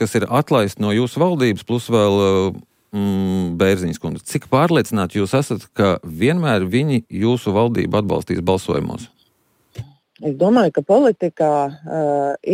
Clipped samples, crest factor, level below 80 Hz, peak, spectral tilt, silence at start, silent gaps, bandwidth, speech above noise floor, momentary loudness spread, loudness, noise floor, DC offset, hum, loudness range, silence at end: under 0.1%; 14 dB; -50 dBFS; -4 dBFS; -6.5 dB/octave; 0 s; none; 16 kHz; 44 dB; 9 LU; -18 LUFS; -62 dBFS; under 0.1%; none; 2 LU; 0 s